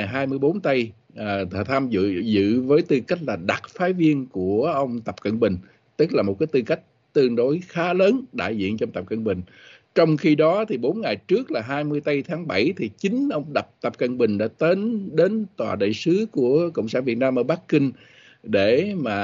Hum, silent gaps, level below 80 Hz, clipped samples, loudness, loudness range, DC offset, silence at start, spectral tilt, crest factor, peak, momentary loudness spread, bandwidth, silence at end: none; none; -62 dBFS; under 0.1%; -22 LUFS; 2 LU; under 0.1%; 0 s; -7.5 dB/octave; 16 dB; -6 dBFS; 8 LU; 7.6 kHz; 0 s